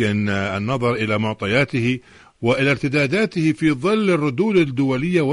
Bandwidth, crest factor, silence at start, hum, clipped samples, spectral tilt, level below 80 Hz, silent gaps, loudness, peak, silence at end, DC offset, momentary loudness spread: 11 kHz; 12 dB; 0 s; none; under 0.1%; -6.5 dB/octave; -52 dBFS; none; -19 LUFS; -6 dBFS; 0 s; under 0.1%; 4 LU